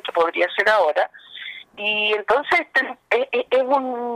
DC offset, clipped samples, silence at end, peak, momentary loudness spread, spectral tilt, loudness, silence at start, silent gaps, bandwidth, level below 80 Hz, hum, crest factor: under 0.1%; under 0.1%; 0 s; -6 dBFS; 12 LU; -3 dB/octave; -20 LUFS; 0.05 s; none; 13 kHz; -66 dBFS; none; 14 dB